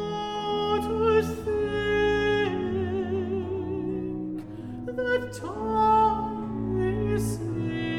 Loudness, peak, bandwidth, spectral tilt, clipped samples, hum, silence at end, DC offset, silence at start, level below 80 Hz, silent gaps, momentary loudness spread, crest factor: -27 LUFS; -10 dBFS; 15.5 kHz; -6.5 dB/octave; under 0.1%; none; 0 s; under 0.1%; 0 s; -44 dBFS; none; 10 LU; 16 dB